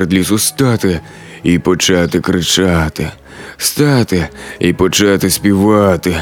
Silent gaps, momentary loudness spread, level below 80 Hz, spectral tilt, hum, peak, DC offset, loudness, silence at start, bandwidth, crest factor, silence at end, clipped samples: none; 12 LU; -34 dBFS; -4.5 dB/octave; none; 0 dBFS; under 0.1%; -12 LUFS; 0 s; 19 kHz; 12 dB; 0 s; under 0.1%